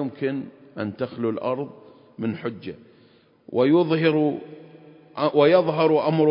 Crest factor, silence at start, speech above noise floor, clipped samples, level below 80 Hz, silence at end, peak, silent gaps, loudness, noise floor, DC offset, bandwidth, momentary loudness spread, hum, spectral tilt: 18 dB; 0 s; 34 dB; under 0.1%; -68 dBFS; 0 s; -4 dBFS; none; -22 LUFS; -56 dBFS; under 0.1%; 5.4 kHz; 18 LU; none; -11.5 dB/octave